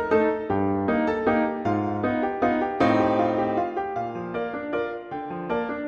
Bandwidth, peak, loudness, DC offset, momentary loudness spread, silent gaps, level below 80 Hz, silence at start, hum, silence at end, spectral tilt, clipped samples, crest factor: 7 kHz; -8 dBFS; -25 LUFS; under 0.1%; 9 LU; none; -54 dBFS; 0 s; none; 0 s; -8 dB/octave; under 0.1%; 16 dB